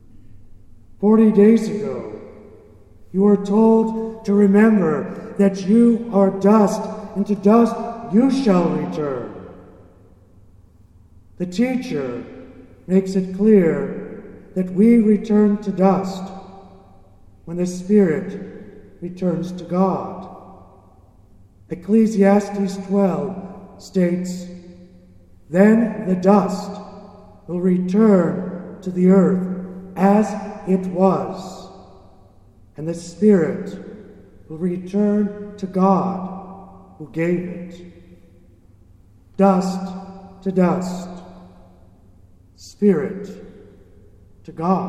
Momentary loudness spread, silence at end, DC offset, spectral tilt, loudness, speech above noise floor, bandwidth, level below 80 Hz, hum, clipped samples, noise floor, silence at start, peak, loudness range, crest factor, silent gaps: 20 LU; 0 s; under 0.1%; -8 dB/octave; -18 LUFS; 32 dB; 10.5 kHz; -52 dBFS; none; under 0.1%; -49 dBFS; 0.15 s; -2 dBFS; 9 LU; 18 dB; none